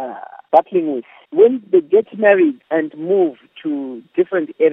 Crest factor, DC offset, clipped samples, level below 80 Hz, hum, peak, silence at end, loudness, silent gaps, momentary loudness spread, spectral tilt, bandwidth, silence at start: 16 dB; under 0.1%; under 0.1%; -78 dBFS; none; 0 dBFS; 0 s; -17 LUFS; none; 12 LU; -9 dB/octave; 3.9 kHz; 0 s